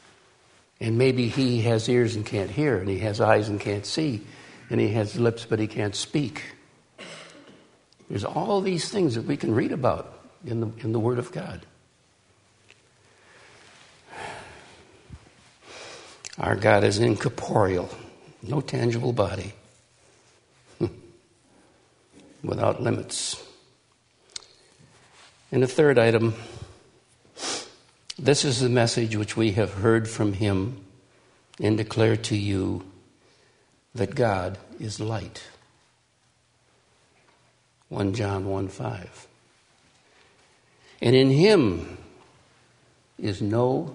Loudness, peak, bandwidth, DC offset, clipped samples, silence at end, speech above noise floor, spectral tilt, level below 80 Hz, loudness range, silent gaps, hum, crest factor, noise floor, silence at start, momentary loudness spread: -25 LUFS; -4 dBFS; 10.5 kHz; under 0.1%; under 0.1%; 0 s; 42 dB; -5.5 dB/octave; -58 dBFS; 11 LU; none; none; 22 dB; -65 dBFS; 0.8 s; 21 LU